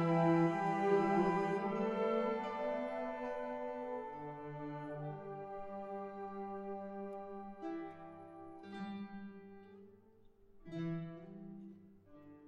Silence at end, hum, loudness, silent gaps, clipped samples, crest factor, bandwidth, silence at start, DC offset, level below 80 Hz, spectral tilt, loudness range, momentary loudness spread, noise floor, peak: 0 s; none; -39 LUFS; none; under 0.1%; 20 dB; 10 kHz; 0 s; under 0.1%; -70 dBFS; -8.5 dB/octave; 14 LU; 20 LU; -64 dBFS; -20 dBFS